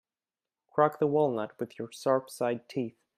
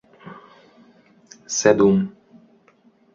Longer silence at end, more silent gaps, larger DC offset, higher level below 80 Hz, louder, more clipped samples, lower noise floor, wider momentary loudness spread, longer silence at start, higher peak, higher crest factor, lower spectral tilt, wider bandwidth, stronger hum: second, 0.3 s vs 1.05 s; neither; neither; second, -78 dBFS vs -58 dBFS; second, -30 LUFS vs -19 LUFS; neither; first, under -90 dBFS vs -57 dBFS; second, 11 LU vs 27 LU; first, 0.75 s vs 0.25 s; second, -10 dBFS vs -2 dBFS; about the same, 22 dB vs 20 dB; first, -6.5 dB/octave vs -5 dB/octave; first, 15 kHz vs 7.8 kHz; neither